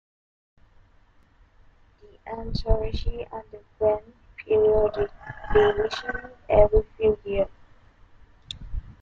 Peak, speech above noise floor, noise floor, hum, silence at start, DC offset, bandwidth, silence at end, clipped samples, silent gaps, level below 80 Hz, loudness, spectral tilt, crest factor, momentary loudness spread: -4 dBFS; 34 dB; -57 dBFS; none; 2.25 s; under 0.1%; 7.4 kHz; 0.1 s; under 0.1%; none; -34 dBFS; -24 LUFS; -6.5 dB/octave; 22 dB; 19 LU